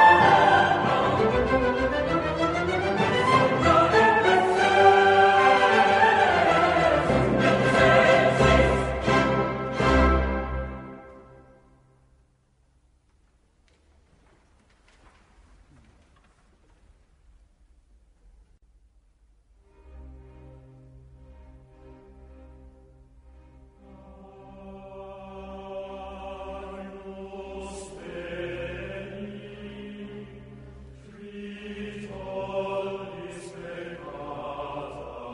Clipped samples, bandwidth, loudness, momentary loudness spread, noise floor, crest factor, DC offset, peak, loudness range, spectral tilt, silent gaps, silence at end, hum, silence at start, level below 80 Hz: under 0.1%; 10.5 kHz; -21 LUFS; 23 LU; -64 dBFS; 20 dB; under 0.1%; -4 dBFS; 21 LU; -5.5 dB/octave; none; 0 s; none; 0 s; -40 dBFS